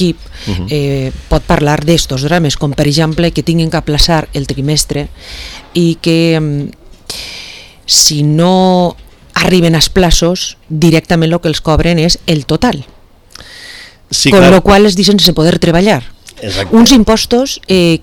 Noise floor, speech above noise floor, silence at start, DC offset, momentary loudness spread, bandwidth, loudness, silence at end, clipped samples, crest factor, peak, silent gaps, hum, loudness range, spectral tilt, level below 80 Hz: -36 dBFS; 27 dB; 0 s; under 0.1%; 17 LU; 19.5 kHz; -10 LUFS; 0.05 s; 1%; 10 dB; 0 dBFS; none; none; 5 LU; -4.5 dB/octave; -24 dBFS